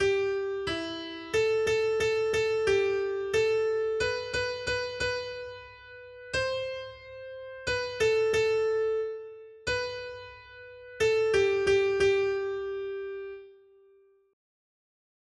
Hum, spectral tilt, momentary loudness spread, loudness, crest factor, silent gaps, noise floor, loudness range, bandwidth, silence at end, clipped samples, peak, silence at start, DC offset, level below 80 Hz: none; -4 dB/octave; 19 LU; -28 LUFS; 16 dB; none; -61 dBFS; 6 LU; 11.5 kHz; 1.8 s; under 0.1%; -14 dBFS; 0 s; under 0.1%; -56 dBFS